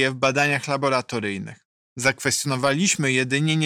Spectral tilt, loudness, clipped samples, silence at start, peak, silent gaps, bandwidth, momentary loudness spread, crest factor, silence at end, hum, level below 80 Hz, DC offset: -3.5 dB/octave; -21 LUFS; under 0.1%; 0 s; -8 dBFS; 1.65-1.96 s; 16.5 kHz; 10 LU; 16 dB; 0 s; none; -62 dBFS; under 0.1%